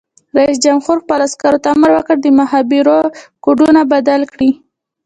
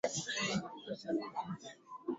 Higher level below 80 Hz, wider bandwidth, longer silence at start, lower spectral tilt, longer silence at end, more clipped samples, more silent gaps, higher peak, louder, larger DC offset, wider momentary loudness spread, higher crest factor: first, -52 dBFS vs -74 dBFS; first, 9.4 kHz vs 7.6 kHz; first, 0.35 s vs 0.05 s; about the same, -4 dB/octave vs -3.5 dB/octave; first, 0.5 s vs 0 s; neither; neither; first, 0 dBFS vs -22 dBFS; first, -12 LUFS vs -39 LUFS; neither; second, 6 LU vs 11 LU; second, 12 dB vs 18 dB